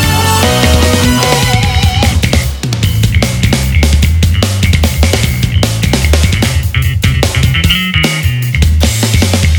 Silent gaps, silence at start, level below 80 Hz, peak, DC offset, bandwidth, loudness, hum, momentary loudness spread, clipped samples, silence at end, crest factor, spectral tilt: none; 0 s; -16 dBFS; 0 dBFS; under 0.1%; over 20 kHz; -10 LUFS; none; 3 LU; 0.1%; 0 s; 10 dB; -4.5 dB/octave